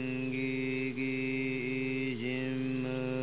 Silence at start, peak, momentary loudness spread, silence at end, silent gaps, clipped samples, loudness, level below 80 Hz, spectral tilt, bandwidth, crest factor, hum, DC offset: 0 s; -24 dBFS; 1 LU; 0 s; none; under 0.1%; -34 LUFS; -70 dBFS; -5.5 dB/octave; 4 kHz; 12 dB; none; 0.3%